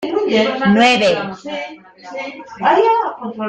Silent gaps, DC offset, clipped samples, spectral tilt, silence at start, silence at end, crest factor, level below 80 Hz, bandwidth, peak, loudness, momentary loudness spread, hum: none; under 0.1%; under 0.1%; -5 dB/octave; 0 s; 0 s; 14 dB; -56 dBFS; 9.2 kHz; -2 dBFS; -15 LUFS; 17 LU; none